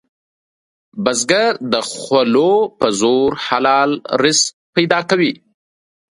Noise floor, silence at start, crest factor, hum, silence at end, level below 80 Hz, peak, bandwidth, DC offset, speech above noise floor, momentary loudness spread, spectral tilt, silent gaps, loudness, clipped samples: under -90 dBFS; 0.95 s; 16 dB; none; 0.75 s; -58 dBFS; 0 dBFS; 11.5 kHz; under 0.1%; over 75 dB; 6 LU; -3 dB/octave; 4.53-4.73 s; -15 LUFS; under 0.1%